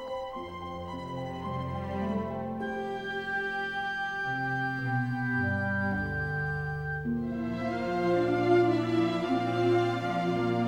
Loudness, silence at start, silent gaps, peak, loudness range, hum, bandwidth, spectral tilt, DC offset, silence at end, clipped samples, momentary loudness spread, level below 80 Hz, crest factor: -30 LUFS; 0 s; none; -14 dBFS; 6 LU; none; 9.6 kHz; -7.5 dB/octave; under 0.1%; 0 s; under 0.1%; 10 LU; -52 dBFS; 16 dB